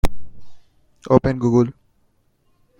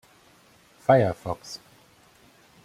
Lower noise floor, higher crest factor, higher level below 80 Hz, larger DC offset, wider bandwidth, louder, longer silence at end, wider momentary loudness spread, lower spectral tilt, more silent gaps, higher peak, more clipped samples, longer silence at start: first, -62 dBFS vs -57 dBFS; about the same, 20 dB vs 24 dB; first, -32 dBFS vs -62 dBFS; neither; about the same, 16.5 kHz vs 15 kHz; first, -19 LUFS vs -24 LUFS; about the same, 1.1 s vs 1.1 s; second, 8 LU vs 20 LU; first, -8 dB/octave vs -6.5 dB/octave; neither; about the same, -2 dBFS vs -4 dBFS; neither; second, 0.05 s vs 0.9 s